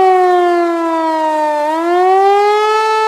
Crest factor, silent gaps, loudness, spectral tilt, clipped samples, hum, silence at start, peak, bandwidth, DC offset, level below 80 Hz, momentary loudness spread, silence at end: 10 dB; none; -12 LUFS; -2.5 dB/octave; under 0.1%; none; 0 s; -2 dBFS; 13.5 kHz; under 0.1%; -60 dBFS; 5 LU; 0 s